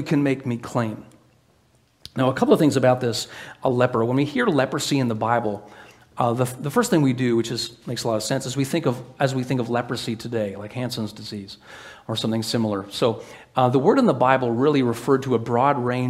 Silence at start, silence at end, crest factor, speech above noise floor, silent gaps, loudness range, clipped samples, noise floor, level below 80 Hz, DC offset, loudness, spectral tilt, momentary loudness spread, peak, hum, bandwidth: 0 s; 0 s; 22 dB; 38 dB; none; 6 LU; under 0.1%; -60 dBFS; -60 dBFS; under 0.1%; -22 LUFS; -6 dB/octave; 12 LU; 0 dBFS; none; 16 kHz